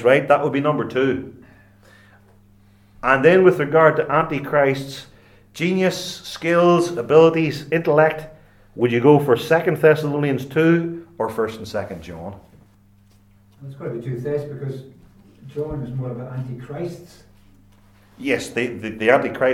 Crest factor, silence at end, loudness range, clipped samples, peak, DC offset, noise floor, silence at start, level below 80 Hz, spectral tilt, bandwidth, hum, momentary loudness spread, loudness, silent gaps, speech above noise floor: 20 dB; 0 s; 14 LU; under 0.1%; 0 dBFS; under 0.1%; -53 dBFS; 0 s; -54 dBFS; -6.5 dB/octave; 15.5 kHz; none; 17 LU; -19 LUFS; none; 34 dB